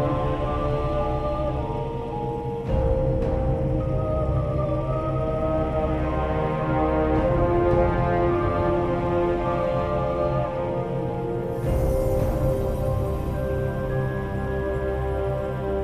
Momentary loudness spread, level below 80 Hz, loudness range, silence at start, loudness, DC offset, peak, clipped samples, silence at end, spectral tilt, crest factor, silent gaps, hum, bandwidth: 6 LU; -30 dBFS; 3 LU; 0 s; -25 LUFS; under 0.1%; -10 dBFS; under 0.1%; 0 s; -9 dB/octave; 14 dB; none; none; 14 kHz